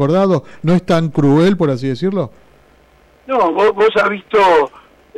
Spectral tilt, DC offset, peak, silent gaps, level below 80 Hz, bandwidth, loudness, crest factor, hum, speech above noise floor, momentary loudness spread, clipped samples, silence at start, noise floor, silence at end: -7.5 dB/octave; under 0.1%; -6 dBFS; none; -48 dBFS; 11.5 kHz; -14 LUFS; 10 dB; none; 36 dB; 7 LU; under 0.1%; 0 s; -49 dBFS; 0.5 s